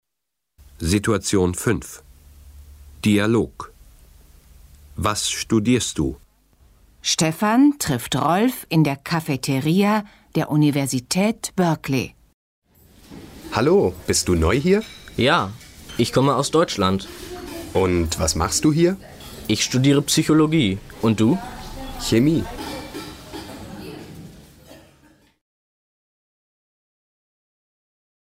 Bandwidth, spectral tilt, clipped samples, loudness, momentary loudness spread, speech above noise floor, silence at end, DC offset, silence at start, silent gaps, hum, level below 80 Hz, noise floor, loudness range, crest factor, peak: 16 kHz; -5 dB/octave; under 0.1%; -20 LUFS; 18 LU; 62 dB; 3.45 s; under 0.1%; 0.8 s; 12.34-12.62 s; none; -42 dBFS; -82 dBFS; 7 LU; 16 dB; -6 dBFS